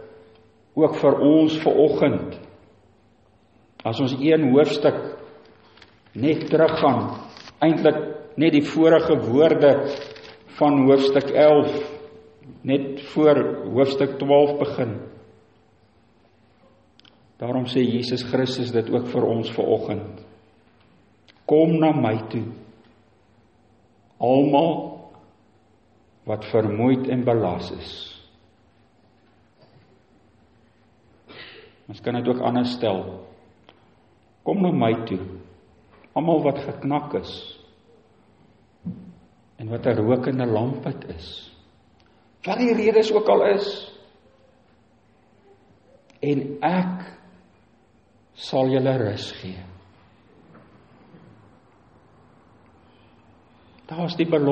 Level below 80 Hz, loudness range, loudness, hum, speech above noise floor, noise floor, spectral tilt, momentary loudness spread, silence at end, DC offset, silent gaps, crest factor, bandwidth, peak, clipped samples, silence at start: -60 dBFS; 10 LU; -21 LUFS; none; 39 dB; -59 dBFS; -7.5 dB/octave; 20 LU; 0 s; under 0.1%; none; 18 dB; 8.4 kHz; -4 dBFS; under 0.1%; 0 s